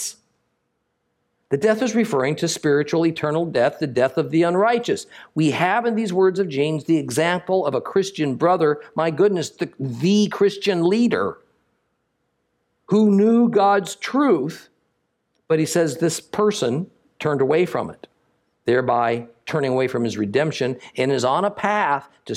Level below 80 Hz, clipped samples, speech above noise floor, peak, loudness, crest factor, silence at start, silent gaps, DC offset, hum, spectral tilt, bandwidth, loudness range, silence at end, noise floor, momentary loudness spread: -68 dBFS; under 0.1%; 53 dB; -4 dBFS; -20 LUFS; 16 dB; 0 s; none; under 0.1%; none; -5.5 dB/octave; 15 kHz; 3 LU; 0 s; -73 dBFS; 8 LU